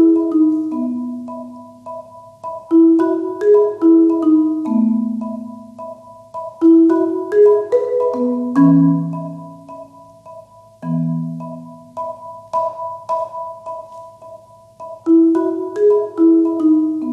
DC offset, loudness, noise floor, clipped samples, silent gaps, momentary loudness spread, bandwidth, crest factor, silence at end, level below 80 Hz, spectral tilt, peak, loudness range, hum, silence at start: under 0.1%; -15 LUFS; -41 dBFS; under 0.1%; none; 21 LU; 2.7 kHz; 14 dB; 0 s; -66 dBFS; -10.5 dB/octave; -2 dBFS; 12 LU; none; 0 s